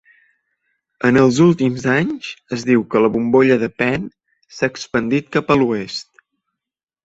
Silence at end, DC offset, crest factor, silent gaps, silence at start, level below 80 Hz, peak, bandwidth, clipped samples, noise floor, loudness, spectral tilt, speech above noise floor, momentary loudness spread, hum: 1 s; under 0.1%; 18 dB; none; 1.05 s; -52 dBFS; 0 dBFS; 8 kHz; under 0.1%; -85 dBFS; -17 LUFS; -6.5 dB/octave; 69 dB; 11 LU; none